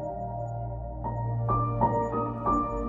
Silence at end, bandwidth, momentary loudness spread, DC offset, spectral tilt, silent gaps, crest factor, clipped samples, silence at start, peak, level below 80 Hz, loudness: 0 s; 7.4 kHz; 9 LU; under 0.1%; -10.5 dB/octave; none; 16 dB; under 0.1%; 0 s; -12 dBFS; -40 dBFS; -29 LUFS